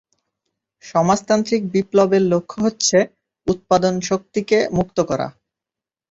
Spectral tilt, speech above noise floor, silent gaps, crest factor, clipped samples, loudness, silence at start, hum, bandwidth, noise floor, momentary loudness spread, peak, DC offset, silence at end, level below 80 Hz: -5 dB/octave; 70 dB; none; 18 dB; under 0.1%; -19 LUFS; 0.85 s; none; 8 kHz; -88 dBFS; 8 LU; -2 dBFS; under 0.1%; 0.8 s; -52 dBFS